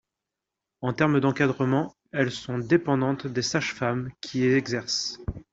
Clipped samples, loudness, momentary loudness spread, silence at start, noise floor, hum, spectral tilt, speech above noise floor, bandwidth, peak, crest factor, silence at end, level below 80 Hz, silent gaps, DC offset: under 0.1%; -26 LUFS; 9 LU; 0.8 s; -86 dBFS; none; -5.5 dB/octave; 61 dB; 7.8 kHz; -6 dBFS; 20 dB; 0.1 s; -52 dBFS; none; under 0.1%